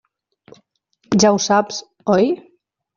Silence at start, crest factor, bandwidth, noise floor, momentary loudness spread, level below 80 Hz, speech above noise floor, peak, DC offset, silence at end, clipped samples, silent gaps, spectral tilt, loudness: 1.1 s; 18 dB; 7.4 kHz; -61 dBFS; 12 LU; -58 dBFS; 46 dB; -2 dBFS; under 0.1%; 0.6 s; under 0.1%; none; -4.5 dB/octave; -17 LUFS